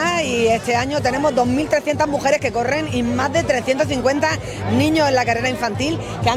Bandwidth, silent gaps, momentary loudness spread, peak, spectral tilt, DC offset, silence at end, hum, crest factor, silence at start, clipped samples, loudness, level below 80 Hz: 16 kHz; none; 4 LU; -2 dBFS; -5 dB/octave; under 0.1%; 0 s; none; 16 dB; 0 s; under 0.1%; -18 LUFS; -42 dBFS